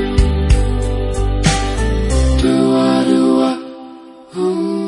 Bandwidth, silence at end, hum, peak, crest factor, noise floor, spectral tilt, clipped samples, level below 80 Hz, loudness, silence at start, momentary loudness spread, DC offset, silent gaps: 11 kHz; 0 s; none; 0 dBFS; 14 dB; -36 dBFS; -6 dB/octave; under 0.1%; -18 dBFS; -15 LUFS; 0 s; 11 LU; under 0.1%; none